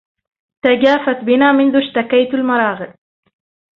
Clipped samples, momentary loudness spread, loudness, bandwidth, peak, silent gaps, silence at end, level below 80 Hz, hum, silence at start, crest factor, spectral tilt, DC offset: under 0.1%; 8 LU; -14 LUFS; 6.2 kHz; 0 dBFS; none; 0.9 s; -60 dBFS; none; 0.65 s; 14 dB; -6.5 dB/octave; under 0.1%